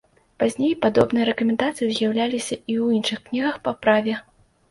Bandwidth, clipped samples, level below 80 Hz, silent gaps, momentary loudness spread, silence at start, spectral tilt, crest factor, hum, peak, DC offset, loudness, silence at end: 11.5 kHz; under 0.1%; -58 dBFS; none; 6 LU; 0.4 s; -4.5 dB/octave; 18 dB; none; -4 dBFS; under 0.1%; -22 LUFS; 0.5 s